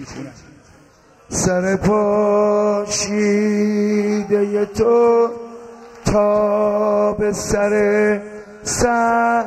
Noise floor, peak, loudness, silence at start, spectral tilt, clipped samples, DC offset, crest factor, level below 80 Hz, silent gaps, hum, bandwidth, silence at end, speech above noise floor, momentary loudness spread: -49 dBFS; -4 dBFS; -17 LUFS; 0 s; -5 dB/octave; under 0.1%; under 0.1%; 14 dB; -42 dBFS; none; none; 14 kHz; 0 s; 33 dB; 10 LU